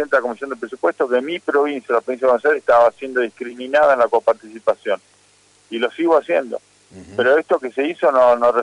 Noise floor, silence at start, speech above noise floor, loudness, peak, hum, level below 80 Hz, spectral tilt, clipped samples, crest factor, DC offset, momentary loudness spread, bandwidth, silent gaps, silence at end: -54 dBFS; 0 s; 37 dB; -18 LUFS; -4 dBFS; 50 Hz at -65 dBFS; -64 dBFS; -4.5 dB/octave; under 0.1%; 12 dB; under 0.1%; 12 LU; 11 kHz; none; 0 s